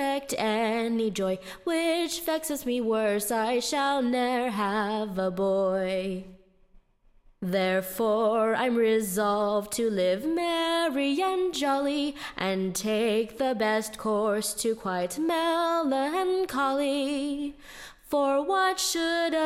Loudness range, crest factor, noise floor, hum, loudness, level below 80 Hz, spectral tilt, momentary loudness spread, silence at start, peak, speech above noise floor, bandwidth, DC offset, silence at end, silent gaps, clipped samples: 3 LU; 14 dB; -60 dBFS; none; -27 LUFS; -60 dBFS; -4 dB/octave; 5 LU; 0 s; -12 dBFS; 33 dB; 16.5 kHz; under 0.1%; 0 s; none; under 0.1%